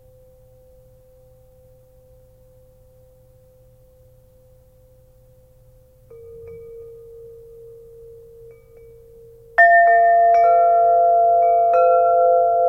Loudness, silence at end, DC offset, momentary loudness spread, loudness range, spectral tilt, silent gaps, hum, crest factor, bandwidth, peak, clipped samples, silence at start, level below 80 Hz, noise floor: -14 LUFS; 0 s; under 0.1%; 27 LU; 6 LU; -5 dB/octave; none; none; 18 dB; 5.4 kHz; -2 dBFS; under 0.1%; 6.4 s; -56 dBFS; -51 dBFS